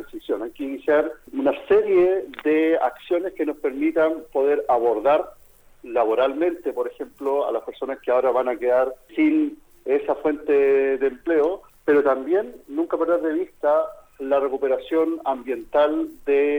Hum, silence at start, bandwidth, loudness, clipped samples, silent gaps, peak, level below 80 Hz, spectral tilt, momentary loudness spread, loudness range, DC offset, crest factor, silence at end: none; 0 s; 16.5 kHz; -22 LUFS; under 0.1%; none; -6 dBFS; -56 dBFS; -6 dB/octave; 9 LU; 2 LU; under 0.1%; 14 dB; 0 s